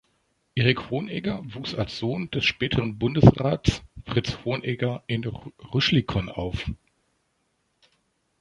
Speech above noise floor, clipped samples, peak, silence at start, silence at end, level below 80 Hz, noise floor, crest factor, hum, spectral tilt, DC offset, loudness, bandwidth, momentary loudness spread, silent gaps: 48 dB; under 0.1%; -2 dBFS; 0.55 s; 1.65 s; -42 dBFS; -72 dBFS; 24 dB; none; -6.5 dB/octave; under 0.1%; -25 LUFS; 10.5 kHz; 14 LU; none